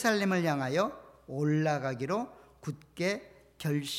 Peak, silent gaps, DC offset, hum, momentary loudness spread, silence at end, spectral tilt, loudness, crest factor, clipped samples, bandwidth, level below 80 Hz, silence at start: -14 dBFS; none; under 0.1%; none; 14 LU; 0 s; -5.5 dB/octave; -32 LUFS; 18 dB; under 0.1%; 16 kHz; -68 dBFS; 0 s